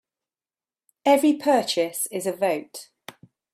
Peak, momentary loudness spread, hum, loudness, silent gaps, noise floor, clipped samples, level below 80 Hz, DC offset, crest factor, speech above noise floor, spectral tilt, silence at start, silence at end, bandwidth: -6 dBFS; 20 LU; none; -23 LUFS; none; under -90 dBFS; under 0.1%; -74 dBFS; under 0.1%; 18 dB; over 68 dB; -3 dB/octave; 1.05 s; 0.7 s; 16 kHz